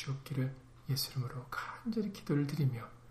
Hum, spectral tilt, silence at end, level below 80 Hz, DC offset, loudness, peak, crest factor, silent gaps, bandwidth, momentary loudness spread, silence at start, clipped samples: none; -6 dB/octave; 0 s; -62 dBFS; under 0.1%; -37 LUFS; -22 dBFS; 16 dB; none; 15.5 kHz; 7 LU; 0 s; under 0.1%